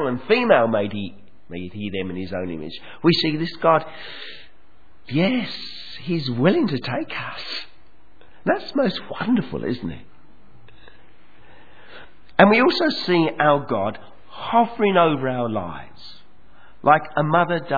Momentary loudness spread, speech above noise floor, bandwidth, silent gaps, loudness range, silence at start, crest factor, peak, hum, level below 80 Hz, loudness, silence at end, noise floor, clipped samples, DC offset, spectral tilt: 18 LU; 36 dB; 5 kHz; none; 7 LU; 0 s; 22 dB; 0 dBFS; none; -56 dBFS; -21 LUFS; 0 s; -57 dBFS; under 0.1%; 1%; -7.5 dB/octave